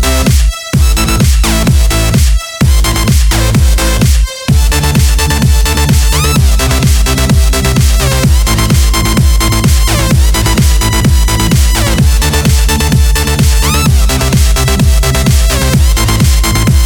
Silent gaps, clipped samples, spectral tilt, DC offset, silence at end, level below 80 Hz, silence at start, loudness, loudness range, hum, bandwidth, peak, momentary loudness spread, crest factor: none; 0.3%; -4.5 dB/octave; under 0.1%; 0 s; -10 dBFS; 0 s; -9 LUFS; 1 LU; none; over 20 kHz; 0 dBFS; 1 LU; 8 dB